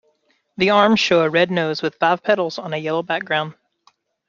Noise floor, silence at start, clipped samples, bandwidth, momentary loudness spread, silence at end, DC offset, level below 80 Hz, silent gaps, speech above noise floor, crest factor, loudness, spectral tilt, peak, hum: -64 dBFS; 0.6 s; under 0.1%; 7.4 kHz; 9 LU; 0.75 s; under 0.1%; -62 dBFS; none; 46 dB; 18 dB; -18 LUFS; -5 dB/octave; -2 dBFS; none